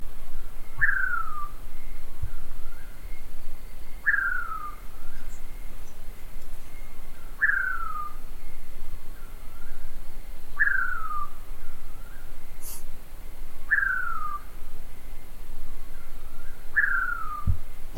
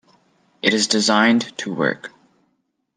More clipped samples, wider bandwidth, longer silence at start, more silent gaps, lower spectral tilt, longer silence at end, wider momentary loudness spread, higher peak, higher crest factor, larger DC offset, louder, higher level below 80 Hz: neither; first, 14 kHz vs 10 kHz; second, 0 s vs 0.65 s; neither; about the same, -4 dB/octave vs -3 dB/octave; second, 0 s vs 0.9 s; first, 22 LU vs 14 LU; second, -8 dBFS vs -2 dBFS; second, 14 dB vs 20 dB; neither; second, -28 LUFS vs -18 LUFS; first, -32 dBFS vs -70 dBFS